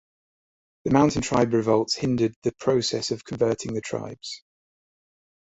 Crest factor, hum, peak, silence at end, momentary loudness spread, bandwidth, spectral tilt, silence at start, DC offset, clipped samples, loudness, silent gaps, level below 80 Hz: 22 dB; none; -4 dBFS; 1.05 s; 14 LU; 8.4 kHz; -5.5 dB/octave; 0.85 s; under 0.1%; under 0.1%; -24 LUFS; 2.36-2.42 s; -54 dBFS